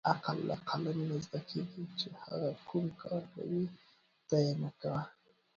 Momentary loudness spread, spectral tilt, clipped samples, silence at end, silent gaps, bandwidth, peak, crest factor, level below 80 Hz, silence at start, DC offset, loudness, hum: 8 LU; -6 dB/octave; under 0.1%; 0.45 s; none; 7.4 kHz; -14 dBFS; 24 dB; -72 dBFS; 0.05 s; under 0.1%; -38 LUFS; none